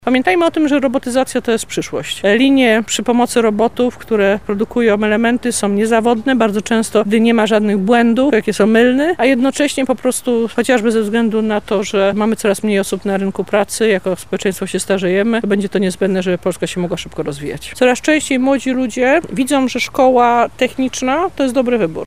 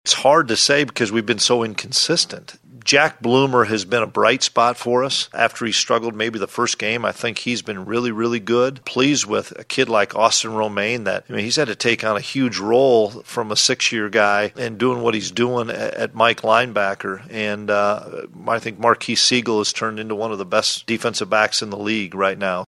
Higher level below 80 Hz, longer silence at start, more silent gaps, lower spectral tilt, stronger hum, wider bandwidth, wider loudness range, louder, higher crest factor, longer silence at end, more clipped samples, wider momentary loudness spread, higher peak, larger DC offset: first, -46 dBFS vs -62 dBFS; about the same, 0.05 s vs 0.05 s; neither; first, -4.5 dB/octave vs -3 dB/octave; neither; first, 16 kHz vs 13 kHz; about the same, 4 LU vs 3 LU; first, -15 LUFS vs -19 LUFS; about the same, 14 dB vs 18 dB; about the same, 0 s vs 0.05 s; neither; about the same, 7 LU vs 9 LU; about the same, 0 dBFS vs 0 dBFS; first, 1% vs under 0.1%